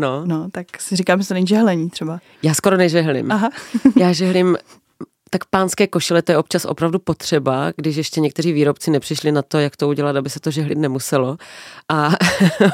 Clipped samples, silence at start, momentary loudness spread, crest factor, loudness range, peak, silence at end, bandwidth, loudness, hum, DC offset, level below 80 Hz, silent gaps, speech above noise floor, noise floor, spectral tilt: under 0.1%; 0 s; 9 LU; 16 dB; 2 LU; 0 dBFS; 0 s; 16.5 kHz; -18 LUFS; none; under 0.1%; -56 dBFS; none; 21 dB; -38 dBFS; -5.5 dB/octave